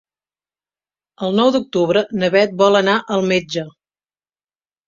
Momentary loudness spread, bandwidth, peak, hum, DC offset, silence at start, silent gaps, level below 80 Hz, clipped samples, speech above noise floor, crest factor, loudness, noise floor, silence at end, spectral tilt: 12 LU; 7.6 kHz; -2 dBFS; 50 Hz at -65 dBFS; under 0.1%; 1.2 s; none; -60 dBFS; under 0.1%; over 74 dB; 18 dB; -16 LUFS; under -90 dBFS; 1.2 s; -5.5 dB/octave